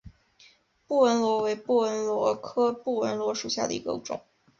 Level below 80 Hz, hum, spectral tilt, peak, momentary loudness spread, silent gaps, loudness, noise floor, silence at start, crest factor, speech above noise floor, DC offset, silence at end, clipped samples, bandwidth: -64 dBFS; none; -4 dB/octave; -10 dBFS; 10 LU; none; -27 LUFS; -59 dBFS; 0.05 s; 18 dB; 33 dB; under 0.1%; 0.4 s; under 0.1%; 7.6 kHz